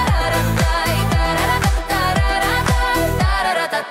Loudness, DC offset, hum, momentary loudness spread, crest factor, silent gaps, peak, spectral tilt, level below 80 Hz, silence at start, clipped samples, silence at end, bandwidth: -17 LUFS; under 0.1%; none; 1 LU; 12 dB; none; -4 dBFS; -4.5 dB/octave; -22 dBFS; 0 s; under 0.1%; 0 s; 16.5 kHz